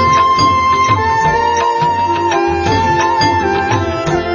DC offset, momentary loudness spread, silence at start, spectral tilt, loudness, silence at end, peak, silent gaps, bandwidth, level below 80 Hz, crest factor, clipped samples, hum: under 0.1%; 4 LU; 0 s; -5 dB/octave; -12 LUFS; 0 s; -2 dBFS; none; 7.4 kHz; -32 dBFS; 12 dB; under 0.1%; none